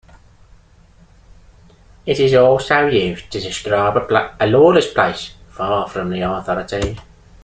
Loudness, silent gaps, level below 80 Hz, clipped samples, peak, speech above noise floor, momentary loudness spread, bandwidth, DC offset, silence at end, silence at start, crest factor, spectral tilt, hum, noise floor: -16 LUFS; none; -42 dBFS; under 0.1%; 0 dBFS; 32 dB; 14 LU; 9.4 kHz; under 0.1%; 0.4 s; 2.05 s; 16 dB; -5.5 dB/octave; none; -48 dBFS